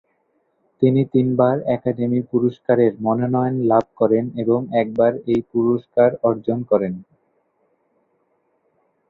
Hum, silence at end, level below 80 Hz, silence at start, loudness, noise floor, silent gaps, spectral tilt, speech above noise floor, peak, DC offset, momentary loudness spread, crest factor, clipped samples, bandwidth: none; 2.05 s; -58 dBFS; 0.8 s; -19 LUFS; -66 dBFS; none; -10.5 dB/octave; 48 dB; -2 dBFS; under 0.1%; 4 LU; 18 dB; under 0.1%; 4.2 kHz